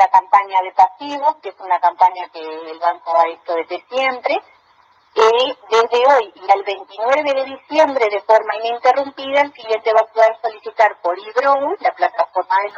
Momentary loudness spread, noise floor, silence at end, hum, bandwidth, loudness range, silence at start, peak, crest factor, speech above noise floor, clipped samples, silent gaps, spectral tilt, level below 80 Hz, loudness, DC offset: 10 LU; -54 dBFS; 0 s; none; 7.6 kHz; 3 LU; 0 s; 0 dBFS; 16 dB; 37 dB; under 0.1%; none; -2 dB/octave; -74 dBFS; -17 LUFS; under 0.1%